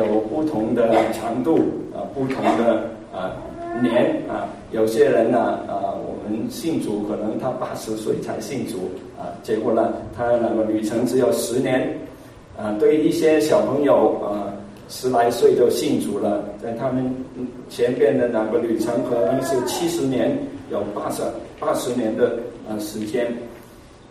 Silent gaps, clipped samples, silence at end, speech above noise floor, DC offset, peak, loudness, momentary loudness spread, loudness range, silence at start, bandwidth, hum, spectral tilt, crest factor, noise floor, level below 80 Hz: none; under 0.1%; 0.05 s; 23 dB; under 0.1%; -4 dBFS; -21 LUFS; 12 LU; 6 LU; 0 s; 15.5 kHz; none; -5.5 dB/octave; 16 dB; -44 dBFS; -52 dBFS